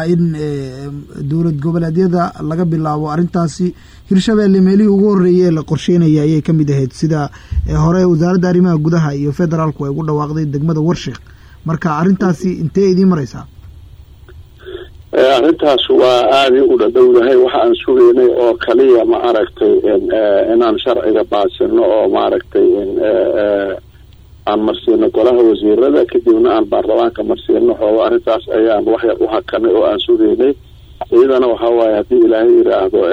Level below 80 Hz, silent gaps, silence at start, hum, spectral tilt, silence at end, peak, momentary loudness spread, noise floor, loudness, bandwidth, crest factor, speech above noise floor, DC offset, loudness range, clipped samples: -36 dBFS; none; 0 s; none; -7.5 dB/octave; 0 s; -2 dBFS; 9 LU; -39 dBFS; -12 LUFS; 8.8 kHz; 10 dB; 28 dB; under 0.1%; 6 LU; under 0.1%